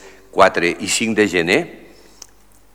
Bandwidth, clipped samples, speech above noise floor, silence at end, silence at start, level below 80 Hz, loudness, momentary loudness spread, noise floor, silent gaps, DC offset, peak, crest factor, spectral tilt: 16.5 kHz; under 0.1%; 35 dB; 1 s; 0.05 s; -52 dBFS; -16 LUFS; 8 LU; -51 dBFS; none; 0.4%; 0 dBFS; 18 dB; -3 dB/octave